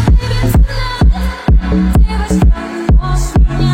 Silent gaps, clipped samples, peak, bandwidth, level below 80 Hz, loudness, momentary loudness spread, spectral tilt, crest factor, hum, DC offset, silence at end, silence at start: none; under 0.1%; 0 dBFS; 16 kHz; -12 dBFS; -13 LUFS; 2 LU; -6.5 dB/octave; 10 dB; none; under 0.1%; 0 s; 0 s